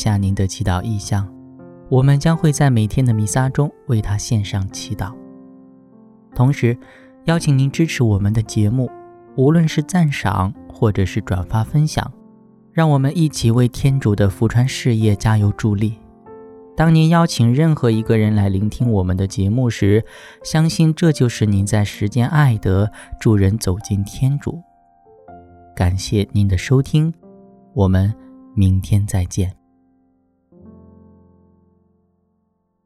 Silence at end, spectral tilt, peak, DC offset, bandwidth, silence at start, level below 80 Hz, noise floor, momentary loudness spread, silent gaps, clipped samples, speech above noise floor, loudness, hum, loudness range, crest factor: 3.35 s; -6.5 dB/octave; -2 dBFS; under 0.1%; 14 kHz; 0 s; -38 dBFS; -67 dBFS; 9 LU; none; under 0.1%; 51 dB; -17 LUFS; none; 5 LU; 16 dB